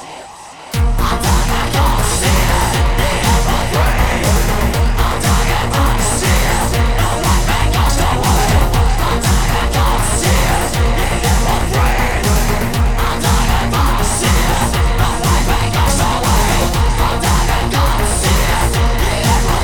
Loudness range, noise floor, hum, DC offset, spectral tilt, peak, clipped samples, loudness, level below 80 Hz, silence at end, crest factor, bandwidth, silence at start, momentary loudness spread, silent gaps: 1 LU; -33 dBFS; none; 1%; -4 dB/octave; 0 dBFS; under 0.1%; -14 LUFS; -16 dBFS; 0 s; 12 dB; 19.5 kHz; 0 s; 2 LU; none